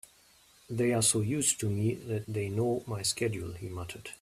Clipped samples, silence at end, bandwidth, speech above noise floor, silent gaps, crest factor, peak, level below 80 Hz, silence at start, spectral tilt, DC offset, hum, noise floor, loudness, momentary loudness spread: under 0.1%; 0.05 s; 15 kHz; 31 dB; none; 18 dB; -14 dBFS; -62 dBFS; 0.7 s; -4 dB/octave; under 0.1%; none; -62 dBFS; -31 LUFS; 14 LU